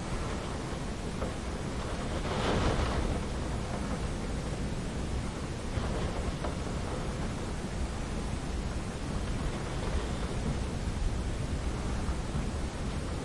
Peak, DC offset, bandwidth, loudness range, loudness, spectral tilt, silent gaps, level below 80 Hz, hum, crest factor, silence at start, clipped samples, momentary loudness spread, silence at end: -18 dBFS; 0.2%; 11.5 kHz; 2 LU; -35 LUFS; -5.5 dB/octave; none; -38 dBFS; none; 16 dB; 0 s; under 0.1%; 4 LU; 0 s